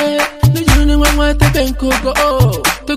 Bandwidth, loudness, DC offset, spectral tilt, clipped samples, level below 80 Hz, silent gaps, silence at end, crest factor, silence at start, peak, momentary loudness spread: 16 kHz; -12 LUFS; under 0.1%; -5 dB/octave; under 0.1%; -18 dBFS; none; 0 s; 12 dB; 0 s; 0 dBFS; 4 LU